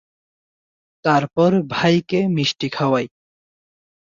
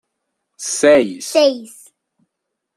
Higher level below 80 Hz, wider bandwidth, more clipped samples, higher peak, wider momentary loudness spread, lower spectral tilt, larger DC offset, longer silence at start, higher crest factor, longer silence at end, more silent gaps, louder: about the same, -60 dBFS vs -62 dBFS; second, 7.4 kHz vs 13.5 kHz; neither; about the same, -4 dBFS vs -2 dBFS; second, 5 LU vs 15 LU; first, -6 dB/octave vs -2.5 dB/octave; neither; first, 1.05 s vs 0.6 s; about the same, 16 dB vs 16 dB; about the same, 1 s vs 1.1 s; neither; second, -19 LUFS vs -15 LUFS